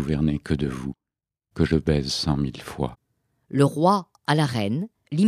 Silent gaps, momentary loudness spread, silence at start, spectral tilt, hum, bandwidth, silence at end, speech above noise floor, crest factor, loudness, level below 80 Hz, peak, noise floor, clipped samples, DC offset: none; 10 LU; 0 s; -6.5 dB/octave; none; 13.5 kHz; 0 s; 66 dB; 20 dB; -24 LUFS; -40 dBFS; -4 dBFS; -88 dBFS; under 0.1%; under 0.1%